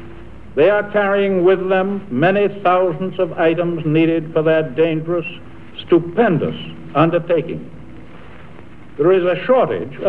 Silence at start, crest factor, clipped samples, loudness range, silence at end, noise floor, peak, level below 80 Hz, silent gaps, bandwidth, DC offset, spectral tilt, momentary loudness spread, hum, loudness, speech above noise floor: 0 s; 16 dB; under 0.1%; 3 LU; 0 s; -40 dBFS; 0 dBFS; -50 dBFS; none; 4.6 kHz; 2%; -9 dB/octave; 13 LU; none; -17 LUFS; 24 dB